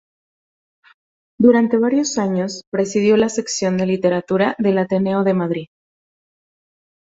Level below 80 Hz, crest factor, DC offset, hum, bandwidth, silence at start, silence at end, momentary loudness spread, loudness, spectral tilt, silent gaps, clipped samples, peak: -58 dBFS; 18 dB; under 0.1%; none; 8 kHz; 1.4 s; 1.55 s; 7 LU; -18 LUFS; -5.5 dB/octave; 2.67-2.72 s; under 0.1%; -2 dBFS